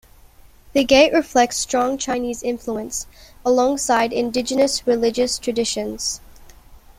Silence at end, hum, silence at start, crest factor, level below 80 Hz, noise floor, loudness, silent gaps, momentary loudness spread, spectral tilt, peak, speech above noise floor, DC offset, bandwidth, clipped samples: 0.25 s; none; 0.75 s; 18 dB; -46 dBFS; -47 dBFS; -19 LUFS; none; 11 LU; -2.5 dB/octave; -2 dBFS; 28 dB; under 0.1%; 16 kHz; under 0.1%